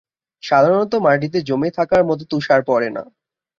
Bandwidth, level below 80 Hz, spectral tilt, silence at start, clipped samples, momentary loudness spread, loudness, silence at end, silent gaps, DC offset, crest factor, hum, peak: 7.4 kHz; -54 dBFS; -7 dB/octave; 0.45 s; under 0.1%; 8 LU; -17 LUFS; 0.55 s; none; under 0.1%; 16 dB; none; -2 dBFS